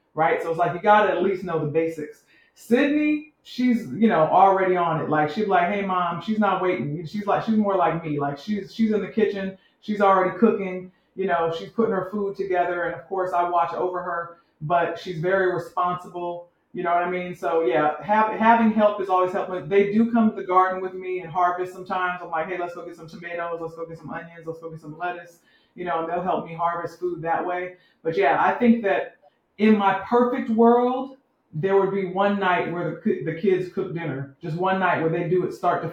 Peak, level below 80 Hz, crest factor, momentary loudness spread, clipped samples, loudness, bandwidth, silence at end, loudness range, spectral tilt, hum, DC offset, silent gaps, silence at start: -2 dBFS; -66 dBFS; 20 dB; 14 LU; under 0.1%; -23 LUFS; 9.8 kHz; 0 s; 7 LU; -7.5 dB/octave; none; under 0.1%; none; 0.15 s